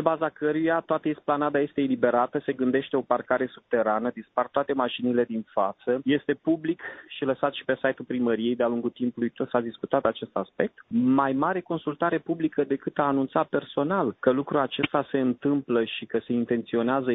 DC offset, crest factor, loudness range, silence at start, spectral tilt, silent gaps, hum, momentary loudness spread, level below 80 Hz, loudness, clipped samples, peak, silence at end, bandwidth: under 0.1%; 20 dB; 2 LU; 0 s; -10 dB/octave; none; none; 5 LU; -66 dBFS; -26 LUFS; under 0.1%; -6 dBFS; 0 s; 4 kHz